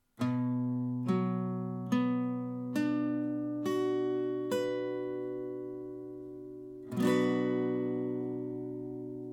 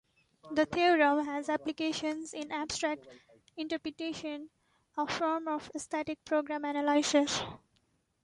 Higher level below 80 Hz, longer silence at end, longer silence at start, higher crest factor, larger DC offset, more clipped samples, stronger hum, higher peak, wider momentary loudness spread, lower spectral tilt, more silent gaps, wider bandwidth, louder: about the same, -72 dBFS vs -68 dBFS; second, 0 s vs 0.65 s; second, 0.2 s vs 0.45 s; about the same, 16 dB vs 18 dB; neither; neither; neither; about the same, -16 dBFS vs -14 dBFS; about the same, 12 LU vs 13 LU; first, -7.5 dB/octave vs -3 dB/octave; neither; first, 16.5 kHz vs 11.5 kHz; about the same, -34 LUFS vs -32 LUFS